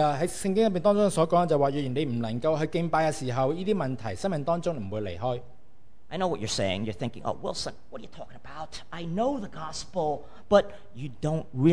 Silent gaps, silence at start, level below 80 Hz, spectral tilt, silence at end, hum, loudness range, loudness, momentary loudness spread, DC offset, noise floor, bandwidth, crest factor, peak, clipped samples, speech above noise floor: none; 0 s; -54 dBFS; -6 dB/octave; 0 s; none; 8 LU; -28 LUFS; 17 LU; 1%; -61 dBFS; 11 kHz; 22 dB; -6 dBFS; under 0.1%; 34 dB